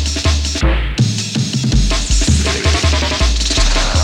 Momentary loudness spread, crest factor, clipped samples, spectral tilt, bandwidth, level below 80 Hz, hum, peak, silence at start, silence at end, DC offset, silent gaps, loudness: 3 LU; 12 dB; under 0.1%; -4 dB/octave; 12.5 kHz; -16 dBFS; none; -2 dBFS; 0 s; 0 s; under 0.1%; none; -15 LUFS